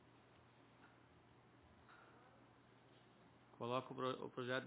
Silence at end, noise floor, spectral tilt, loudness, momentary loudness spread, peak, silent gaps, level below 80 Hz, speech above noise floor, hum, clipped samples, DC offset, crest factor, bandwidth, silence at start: 0 s; -69 dBFS; -4 dB/octave; -46 LUFS; 23 LU; -26 dBFS; none; -84 dBFS; 24 dB; none; under 0.1%; under 0.1%; 24 dB; 4 kHz; 0 s